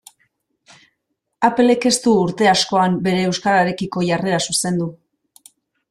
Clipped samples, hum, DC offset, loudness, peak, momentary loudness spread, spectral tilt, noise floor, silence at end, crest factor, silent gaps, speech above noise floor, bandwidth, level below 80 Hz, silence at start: under 0.1%; none; under 0.1%; -17 LUFS; -2 dBFS; 6 LU; -4 dB/octave; -74 dBFS; 0.95 s; 18 dB; none; 57 dB; 13.5 kHz; -58 dBFS; 1.4 s